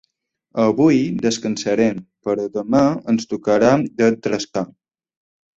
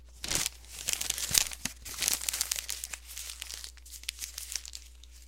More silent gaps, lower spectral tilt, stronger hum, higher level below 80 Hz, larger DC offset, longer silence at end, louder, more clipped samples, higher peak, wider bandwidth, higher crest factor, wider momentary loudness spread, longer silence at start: neither; first, -6 dB/octave vs 0.5 dB/octave; neither; about the same, -56 dBFS vs -52 dBFS; neither; first, 0.9 s vs 0 s; first, -19 LUFS vs -32 LUFS; neither; about the same, -2 dBFS vs 0 dBFS; second, 8 kHz vs 17 kHz; second, 16 dB vs 36 dB; second, 10 LU vs 14 LU; first, 0.55 s vs 0 s